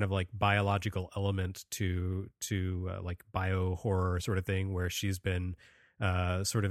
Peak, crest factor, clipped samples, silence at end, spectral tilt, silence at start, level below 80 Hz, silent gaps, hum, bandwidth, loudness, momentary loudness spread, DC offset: -12 dBFS; 20 dB; under 0.1%; 0 s; -5.5 dB/octave; 0 s; -52 dBFS; none; none; 15 kHz; -33 LUFS; 8 LU; under 0.1%